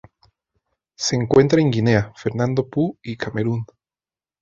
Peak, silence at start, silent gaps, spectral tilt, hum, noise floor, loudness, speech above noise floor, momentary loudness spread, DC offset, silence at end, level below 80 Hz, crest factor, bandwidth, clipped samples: -2 dBFS; 1 s; none; -6 dB/octave; none; under -90 dBFS; -20 LUFS; over 71 dB; 12 LU; under 0.1%; 0.75 s; -50 dBFS; 20 dB; 7.8 kHz; under 0.1%